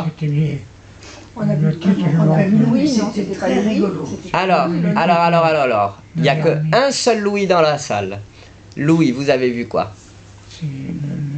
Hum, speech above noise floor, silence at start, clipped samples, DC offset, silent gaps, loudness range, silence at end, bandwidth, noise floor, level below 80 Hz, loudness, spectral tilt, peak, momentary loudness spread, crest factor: none; 24 dB; 0 s; under 0.1%; under 0.1%; none; 3 LU; 0 s; 9 kHz; -40 dBFS; -50 dBFS; -16 LUFS; -6 dB/octave; -2 dBFS; 12 LU; 14 dB